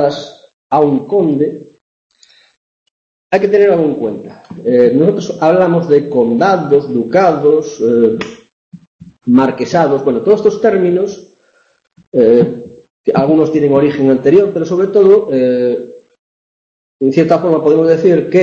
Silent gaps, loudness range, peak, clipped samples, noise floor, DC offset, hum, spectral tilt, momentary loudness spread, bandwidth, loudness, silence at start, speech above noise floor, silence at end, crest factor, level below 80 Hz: 0.53-0.70 s, 1.81-2.10 s, 2.57-3.30 s, 8.52-8.72 s, 8.87-8.99 s, 12.07-12.12 s, 12.90-13.04 s, 16.19-16.99 s; 4 LU; 0 dBFS; under 0.1%; -54 dBFS; under 0.1%; none; -7.5 dB/octave; 11 LU; 7.4 kHz; -12 LUFS; 0 s; 43 dB; 0 s; 12 dB; -54 dBFS